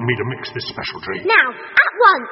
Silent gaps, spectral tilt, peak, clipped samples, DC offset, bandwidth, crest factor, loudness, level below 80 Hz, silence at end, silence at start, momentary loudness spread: none; -2 dB/octave; 0 dBFS; under 0.1%; under 0.1%; 6 kHz; 18 dB; -16 LUFS; -54 dBFS; 0 s; 0 s; 14 LU